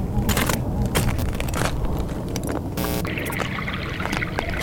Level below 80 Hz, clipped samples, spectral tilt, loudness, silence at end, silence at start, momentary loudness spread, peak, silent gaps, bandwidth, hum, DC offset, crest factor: -30 dBFS; under 0.1%; -5 dB/octave; -25 LUFS; 0 s; 0 s; 5 LU; -4 dBFS; none; over 20 kHz; none; under 0.1%; 20 dB